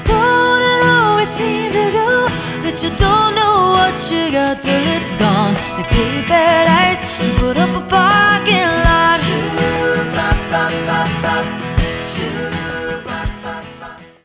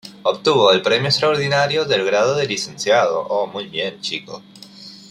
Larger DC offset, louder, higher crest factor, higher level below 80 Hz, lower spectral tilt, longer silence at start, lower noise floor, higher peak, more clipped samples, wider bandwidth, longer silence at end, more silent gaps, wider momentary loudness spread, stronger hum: neither; first, -14 LUFS vs -18 LUFS; about the same, 14 dB vs 18 dB; first, -28 dBFS vs -60 dBFS; first, -9.5 dB/octave vs -3.5 dB/octave; about the same, 0 s vs 0.05 s; second, -35 dBFS vs -40 dBFS; about the same, 0 dBFS vs -2 dBFS; neither; second, 4 kHz vs 13.5 kHz; about the same, 0.2 s vs 0.15 s; neither; second, 11 LU vs 17 LU; neither